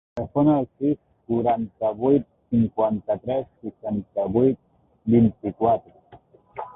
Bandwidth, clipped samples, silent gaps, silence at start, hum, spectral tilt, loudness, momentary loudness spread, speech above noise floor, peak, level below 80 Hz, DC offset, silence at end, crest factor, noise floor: 3.8 kHz; under 0.1%; none; 0.15 s; none; -12 dB/octave; -23 LUFS; 12 LU; 30 dB; -6 dBFS; -52 dBFS; under 0.1%; 0.05 s; 18 dB; -52 dBFS